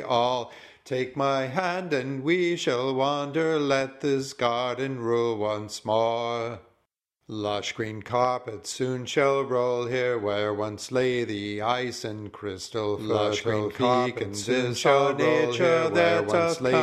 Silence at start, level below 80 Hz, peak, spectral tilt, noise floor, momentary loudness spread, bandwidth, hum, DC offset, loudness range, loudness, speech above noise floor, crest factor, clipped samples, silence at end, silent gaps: 0 s; -64 dBFS; -8 dBFS; -5 dB/octave; -75 dBFS; 10 LU; 13.5 kHz; none; under 0.1%; 5 LU; -26 LUFS; 50 dB; 18 dB; under 0.1%; 0 s; none